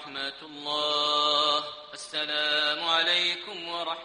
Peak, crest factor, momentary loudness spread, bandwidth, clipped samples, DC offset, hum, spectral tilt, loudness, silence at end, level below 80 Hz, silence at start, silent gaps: -10 dBFS; 18 dB; 12 LU; 10.5 kHz; under 0.1%; under 0.1%; none; -1 dB/octave; -26 LUFS; 0 s; -76 dBFS; 0 s; none